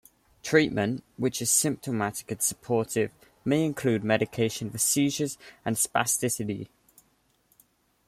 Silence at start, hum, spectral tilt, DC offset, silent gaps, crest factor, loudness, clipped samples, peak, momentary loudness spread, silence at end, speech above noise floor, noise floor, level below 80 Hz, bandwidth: 0.45 s; none; -4 dB/octave; under 0.1%; none; 22 dB; -27 LUFS; under 0.1%; -6 dBFS; 10 LU; 1.4 s; 41 dB; -68 dBFS; -62 dBFS; 16 kHz